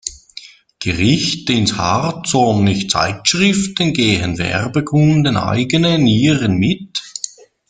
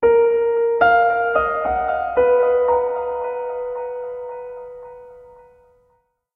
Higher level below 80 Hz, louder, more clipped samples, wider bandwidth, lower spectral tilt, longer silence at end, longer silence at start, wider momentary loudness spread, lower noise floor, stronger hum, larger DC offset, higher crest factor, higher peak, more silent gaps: about the same, -44 dBFS vs -48 dBFS; first, -15 LUFS vs -19 LUFS; neither; first, 9.6 kHz vs 4.5 kHz; second, -4.5 dB/octave vs -7.5 dB/octave; second, 0.45 s vs 1.1 s; about the same, 0.05 s vs 0 s; second, 12 LU vs 18 LU; second, -39 dBFS vs -64 dBFS; neither; neither; about the same, 16 dB vs 16 dB; first, 0 dBFS vs -4 dBFS; neither